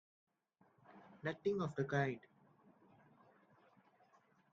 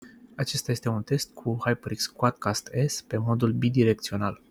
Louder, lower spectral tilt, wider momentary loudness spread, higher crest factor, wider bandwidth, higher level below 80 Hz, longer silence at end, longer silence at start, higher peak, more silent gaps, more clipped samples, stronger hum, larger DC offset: second, -41 LUFS vs -27 LUFS; about the same, -6 dB/octave vs -5.5 dB/octave; first, 20 LU vs 7 LU; about the same, 22 dB vs 20 dB; second, 7.4 kHz vs 16 kHz; second, -82 dBFS vs -58 dBFS; first, 2.35 s vs 0.15 s; first, 0.9 s vs 0 s; second, -24 dBFS vs -6 dBFS; neither; neither; neither; neither